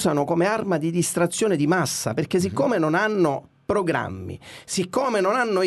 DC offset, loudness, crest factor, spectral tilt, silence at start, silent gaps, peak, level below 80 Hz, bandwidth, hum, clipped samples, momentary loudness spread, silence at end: under 0.1%; -23 LUFS; 14 dB; -5 dB/octave; 0 s; none; -8 dBFS; -58 dBFS; 12.5 kHz; none; under 0.1%; 8 LU; 0 s